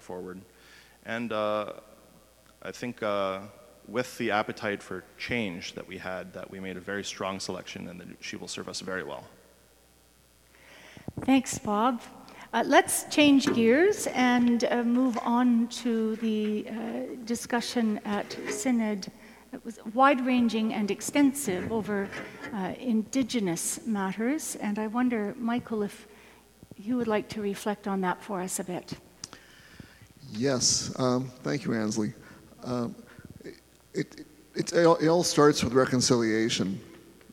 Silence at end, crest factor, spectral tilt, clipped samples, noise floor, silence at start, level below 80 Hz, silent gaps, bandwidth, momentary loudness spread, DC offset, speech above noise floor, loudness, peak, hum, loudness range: 0.2 s; 22 dB; -4 dB/octave; under 0.1%; -60 dBFS; 0.05 s; -62 dBFS; none; 16.5 kHz; 19 LU; under 0.1%; 33 dB; -28 LUFS; -6 dBFS; none; 11 LU